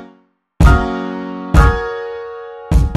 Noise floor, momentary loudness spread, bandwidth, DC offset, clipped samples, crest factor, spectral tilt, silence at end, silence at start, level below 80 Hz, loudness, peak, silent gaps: -52 dBFS; 15 LU; 12 kHz; under 0.1%; under 0.1%; 14 dB; -7 dB/octave; 0 s; 0 s; -16 dBFS; -16 LUFS; 0 dBFS; none